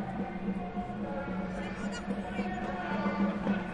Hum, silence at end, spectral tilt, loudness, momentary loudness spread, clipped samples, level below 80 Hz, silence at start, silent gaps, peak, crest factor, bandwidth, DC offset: none; 0 s; -7 dB/octave; -35 LUFS; 6 LU; under 0.1%; -52 dBFS; 0 s; none; -18 dBFS; 16 dB; 10.5 kHz; under 0.1%